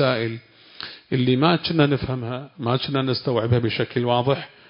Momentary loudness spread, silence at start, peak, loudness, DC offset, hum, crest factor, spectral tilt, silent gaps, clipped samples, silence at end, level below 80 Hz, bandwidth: 12 LU; 0 s; -2 dBFS; -22 LUFS; under 0.1%; none; 20 dB; -11 dB/octave; none; under 0.1%; 0.2 s; -50 dBFS; 5.4 kHz